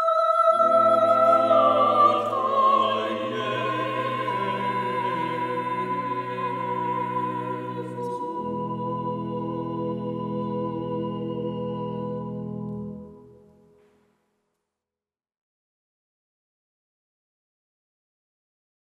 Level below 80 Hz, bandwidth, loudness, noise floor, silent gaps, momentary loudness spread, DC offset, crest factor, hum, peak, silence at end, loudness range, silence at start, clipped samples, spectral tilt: -66 dBFS; 12 kHz; -24 LUFS; under -90 dBFS; none; 13 LU; under 0.1%; 18 dB; none; -8 dBFS; 5.7 s; 15 LU; 0 s; under 0.1%; -7 dB/octave